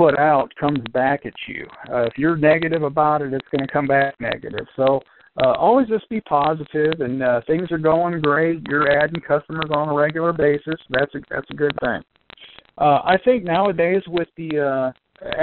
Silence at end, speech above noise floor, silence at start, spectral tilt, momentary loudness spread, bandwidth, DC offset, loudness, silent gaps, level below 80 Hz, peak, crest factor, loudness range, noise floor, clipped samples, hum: 0 s; 26 dB; 0 s; -4.5 dB/octave; 9 LU; 4.4 kHz; under 0.1%; -20 LUFS; none; -52 dBFS; -2 dBFS; 18 dB; 2 LU; -45 dBFS; under 0.1%; none